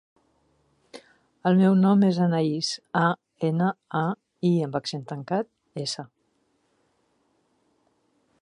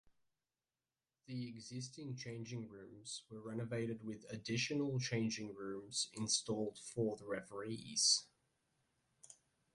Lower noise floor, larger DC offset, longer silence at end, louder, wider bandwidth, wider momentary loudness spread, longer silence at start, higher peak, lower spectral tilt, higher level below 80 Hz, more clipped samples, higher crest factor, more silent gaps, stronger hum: second, -70 dBFS vs under -90 dBFS; neither; first, 2.35 s vs 0.4 s; first, -25 LUFS vs -41 LUFS; about the same, 10.5 kHz vs 11.5 kHz; about the same, 14 LU vs 13 LU; second, 0.95 s vs 1.3 s; first, -8 dBFS vs -20 dBFS; first, -6.5 dB/octave vs -3 dB/octave; first, -72 dBFS vs -78 dBFS; neither; second, 18 dB vs 24 dB; neither; neither